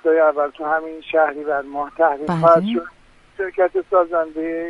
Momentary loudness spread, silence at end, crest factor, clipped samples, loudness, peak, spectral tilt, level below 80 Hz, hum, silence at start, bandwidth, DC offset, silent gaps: 12 LU; 0 s; 18 dB; under 0.1%; -19 LUFS; -2 dBFS; -8 dB/octave; -54 dBFS; none; 0.05 s; 6.2 kHz; under 0.1%; none